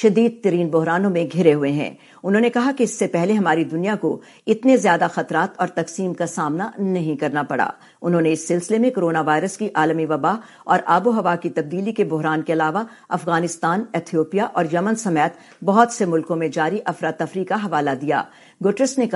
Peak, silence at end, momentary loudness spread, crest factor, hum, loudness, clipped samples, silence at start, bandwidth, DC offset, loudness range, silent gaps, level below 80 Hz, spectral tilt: 0 dBFS; 0 s; 7 LU; 18 dB; none; -20 LUFS; under 0.1%; 0 s; 11.5 kHz; under 0.1%; 3 LU; none; -72 dBFS; -6 dB/octave